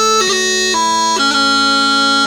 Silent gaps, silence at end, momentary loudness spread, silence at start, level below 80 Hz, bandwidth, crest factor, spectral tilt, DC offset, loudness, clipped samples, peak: none; 0 s; 2 LU; 0 s; -48 dBFS; over 20 kHz; 12 dB; -0.5 dB/octave; under 0.1%; -11 LUFS; under 0.1%; -2 dBFS